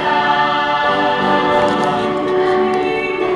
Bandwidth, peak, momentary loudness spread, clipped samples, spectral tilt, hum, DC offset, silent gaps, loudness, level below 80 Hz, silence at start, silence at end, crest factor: 11.5 kHz; -2 dBFS; 3 LU; under 0.1%; -5.5 dB/octave; none; under 0.1%; none; -15 LUFS; -48 dBFS; 0 s; 0 s; 14 dB